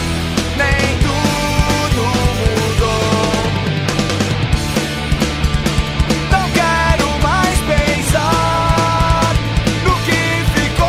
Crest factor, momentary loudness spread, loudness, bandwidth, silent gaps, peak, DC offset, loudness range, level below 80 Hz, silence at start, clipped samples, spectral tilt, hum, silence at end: 14 dB; 4 LU; -15 LUFS; 16 kHz; none; 0 dBFS; under 0.1%; 2 LU; -22 dBFS; 0 s; under 0.1%; -4.5 dB/octave; none; 0 s